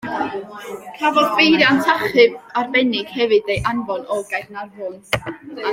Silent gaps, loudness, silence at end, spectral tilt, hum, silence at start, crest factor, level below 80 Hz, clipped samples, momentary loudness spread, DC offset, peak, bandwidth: none; -17 LUFS; 0 s; -4.5 dB/octave; none; 0.05 s; 18 dB; -50 dBFS; under 0.1%; 18 LU; under 0.1%; -2 dBFS; 16.5 kHz